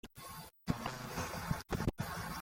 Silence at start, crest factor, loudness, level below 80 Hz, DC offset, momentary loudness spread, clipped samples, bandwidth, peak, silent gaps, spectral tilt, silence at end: 0.05 s; 22 dB; -41 LUFS; -52 dBFS; under 0.1%; 11 LU; under 0.1%; 16.5 kHz; -20 dBFS; none; -5 dB/octave; 0 s